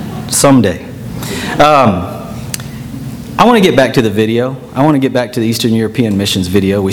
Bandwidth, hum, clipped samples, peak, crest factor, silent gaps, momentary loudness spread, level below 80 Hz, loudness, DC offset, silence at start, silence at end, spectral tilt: over 20 kHz; none; 0.5%; 0 dBFS; 12 dB; none; 15 LU; -38 dBFS; -11 LUFS; under 0.1%; 0 s; 0 s; -5 dB/octave